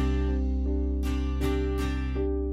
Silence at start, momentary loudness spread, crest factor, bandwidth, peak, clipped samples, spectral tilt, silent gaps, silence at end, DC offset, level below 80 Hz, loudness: 0 s; 2 LU; 14 dB; 12.5 kHz; -14 dBFS; under 0.1%; -7.5 dB/octave; none; 0 s; under 0.1%; -28 dBFS; -29 LUFS